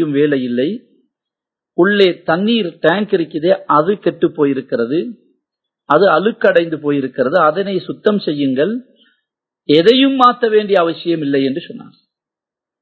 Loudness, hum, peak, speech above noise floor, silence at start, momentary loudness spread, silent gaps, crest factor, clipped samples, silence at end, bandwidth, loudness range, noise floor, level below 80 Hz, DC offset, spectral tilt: -14 LUFS; none; 0 dBFS; 72 dB; 0 s; 10 LU; none; 16 dB; under 0.1%; 1 s; 8 kHz; 2 LU; -86 dBFS; -66 dBFS; under 0.1%; -7.5 dB/octave